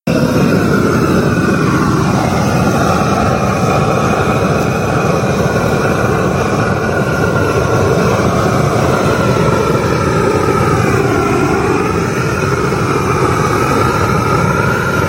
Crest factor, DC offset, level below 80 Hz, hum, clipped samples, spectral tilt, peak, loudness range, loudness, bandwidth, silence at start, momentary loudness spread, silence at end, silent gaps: 12 dB; under 0.1%; -30 dBFS; none; under 0.1%; -6 dB/octave; 0 dBFS; 1 LU; -13 LUFS; 16 kHz; 0.05 s; 2 LU; 0 s; none